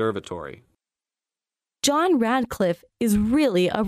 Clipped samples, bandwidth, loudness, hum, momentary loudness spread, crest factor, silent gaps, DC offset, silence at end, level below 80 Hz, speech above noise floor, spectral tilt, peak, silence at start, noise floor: under 0.1%; 15.5 kHz; -22 LUFS; none; 14 LU; 18 dB; none; under 0.1%; 0 s; -48 dBFS; over 68 dB; -4.5 dB/octave; -6 dBFS; 0 s; under -90 dBFS